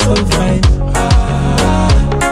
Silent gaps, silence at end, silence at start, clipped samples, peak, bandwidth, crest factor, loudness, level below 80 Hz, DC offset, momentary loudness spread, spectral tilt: none; 0 s; 0 s; under 0.1%; 0 dBFS; 15 kHz; 10 dB; -12 LUFS; -14 dBFS; under 0.1%; 1 LU; -5.5 dB/octave